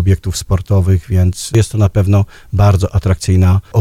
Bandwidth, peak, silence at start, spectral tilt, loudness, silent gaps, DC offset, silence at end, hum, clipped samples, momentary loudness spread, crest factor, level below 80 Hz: 14 kHz; 0 dBFS; 0 s; -6.5 dB/octave; -13 LUFS; none; under 0.1%; 0 s; none; under 0.1%; 4 LU; 12 dB; -28 dBFS